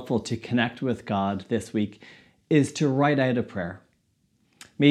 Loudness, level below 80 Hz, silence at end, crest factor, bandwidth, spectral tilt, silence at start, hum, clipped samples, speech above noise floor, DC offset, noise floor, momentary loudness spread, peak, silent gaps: -26 LUFS; -62 dBFS; 0 s; 20 dB; 12 kHz; -6.5 dB/octave; 0 s; none; under 0.1%; 43 dB; under 0.1%; -68 dBFS; 11 LU; -6 dBFS; none